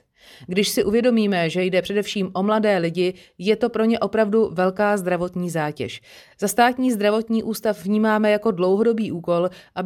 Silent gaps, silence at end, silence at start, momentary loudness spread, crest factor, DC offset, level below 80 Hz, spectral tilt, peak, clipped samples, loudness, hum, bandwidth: none; 0 s; 0.4 s; 7 LU; 16 dB; under 0.1%; -56 dBFS; -5.5 dB/octave; -4 dBFS; under 0.1%; -21 LUFS; none; 17.5 kHz